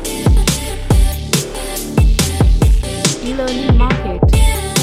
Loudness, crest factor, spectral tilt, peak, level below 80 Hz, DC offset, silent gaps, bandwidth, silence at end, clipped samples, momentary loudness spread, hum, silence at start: -15 LUFS; 12 dB; -4.5 dB/octave; 0 dBFS; -16 dBFS; under 0.1%; none; 16 kHz; 0 s; under 0.1%; 6 LU; none; 0 s